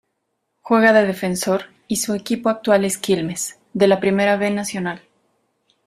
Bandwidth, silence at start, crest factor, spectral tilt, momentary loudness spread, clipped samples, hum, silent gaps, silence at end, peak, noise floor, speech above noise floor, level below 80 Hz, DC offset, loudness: 15.5 kHz; 0.65 s; 18 dB; -4.5 dB/octave; 11 LU; under 0.1%; none; none; 0.9 s; -2 dBFS; -73 dBFS; 55 dB; -60 dBFS; under 0.1%; -19 LUFS